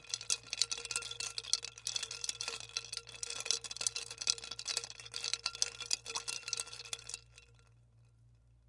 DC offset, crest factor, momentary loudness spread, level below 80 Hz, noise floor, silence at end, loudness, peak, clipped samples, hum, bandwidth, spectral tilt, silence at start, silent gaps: under 0.1%; 34 dB; 8 LU; -70 dBFS; -65 dBFS; 0.3 s; -37 LUFS; -8 dBFS; under 0.1%; none; 11.5 kHz; 1.5 dB/octave; 0 s; none